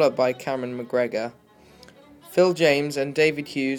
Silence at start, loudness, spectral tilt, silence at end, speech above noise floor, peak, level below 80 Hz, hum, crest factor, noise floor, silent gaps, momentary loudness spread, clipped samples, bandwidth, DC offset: 0 s; -23 LUFS; -5 dB/octave; 0 s; 28 dB; -4 dBFS; -66 dBFS; none; 20 dB; -51 dBFS; none; 10 LU; under 0.1%; 19 kHz; under 0.1%